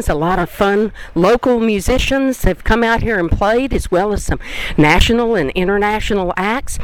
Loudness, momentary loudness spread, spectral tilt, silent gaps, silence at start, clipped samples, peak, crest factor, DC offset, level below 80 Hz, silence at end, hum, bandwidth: -15 LUFS; 6 LU; -5 dB/octave; none; 0 s; under 0.1%; 0 dBFS; 14 dB; under 0.1%; -24 dBFS; 0 s; none; 17.5 kHz